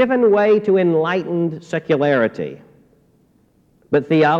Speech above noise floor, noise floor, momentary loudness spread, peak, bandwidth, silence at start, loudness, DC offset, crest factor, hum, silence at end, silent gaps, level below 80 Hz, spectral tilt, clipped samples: 41 dB; -57 dBFS; 9 LU; -4 dBFS; 7.8 kHz; 0 s; -17 LUFS; under 0.1%; 12 dB; none; 0 s; none; -62 dBFS; -8 dB/octave; under 0.1%